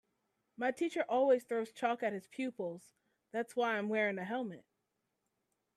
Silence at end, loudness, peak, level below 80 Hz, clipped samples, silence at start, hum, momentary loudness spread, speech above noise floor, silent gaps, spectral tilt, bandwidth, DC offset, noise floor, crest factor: 1.15 s; -36 LUFS; -18 dBFS; -88 dBFS; under 0.1%; 0.6 s; none; 12 LU; 49 dB; none; -5.5 dB/octave; 13.5 kHz; under 0.1%; -85 dBFS; 18 dB